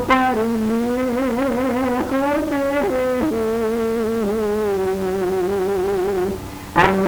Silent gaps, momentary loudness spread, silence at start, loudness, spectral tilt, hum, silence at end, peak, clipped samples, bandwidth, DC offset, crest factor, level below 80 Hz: none; 4 LU; 0 s; -20 LUFS; -6 dB/octave; none; 0 s; 0 dBFS; under 0.1%; over 20 kHz; under 0.1%; 18 dB; -42 dBFS